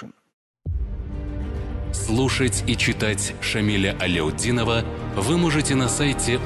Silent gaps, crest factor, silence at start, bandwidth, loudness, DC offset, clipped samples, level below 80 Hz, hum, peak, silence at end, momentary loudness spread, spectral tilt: 0.33-0.54 s; 14 dB; 0 s; 12.5 kHz; -23 LUFS; under 0.1%; under 0.1%; -32 dBFS; none; -8 dBFS; 0 s; 11 LU; -4.5 dB/octave